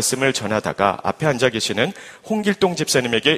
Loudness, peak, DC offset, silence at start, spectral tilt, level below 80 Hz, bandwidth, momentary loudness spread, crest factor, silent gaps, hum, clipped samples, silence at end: -20 LUFS; 0 dBFS; under 0.1%; 0 s; -3.5 dB/octave; -54 dBFS; 15.5 kHz; 5 LU; 20 dB; none; none; under 0.1%; 0 s